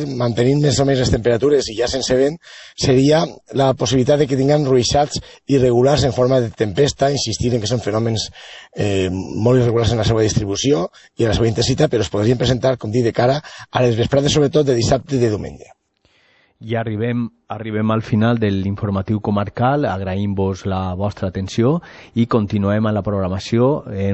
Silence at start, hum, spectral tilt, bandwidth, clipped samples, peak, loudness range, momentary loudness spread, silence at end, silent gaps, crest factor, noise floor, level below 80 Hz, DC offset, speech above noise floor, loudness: 0 s; none; -6 dB/octave; 8.4 kHz; under 0.1%; -2 dBFS; 4 LU; 8 LU; 0 s; none; 14 dB; -59 dBFS; -40 dBFS; under 0.1%; 42 dB; -17 LUFS